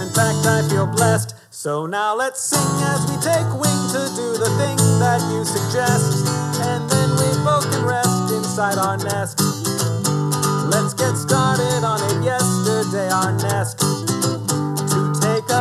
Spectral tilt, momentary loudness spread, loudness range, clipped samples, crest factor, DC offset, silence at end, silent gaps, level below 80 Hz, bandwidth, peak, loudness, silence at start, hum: -4.5 dB/octave; 4 LU; 1 LU; under 0.1%; 18 dB; under 0.1%; 0 s; none; -62 dBFS; 15 kHz; -2 dBFS; -19 LUFS; 0 s; none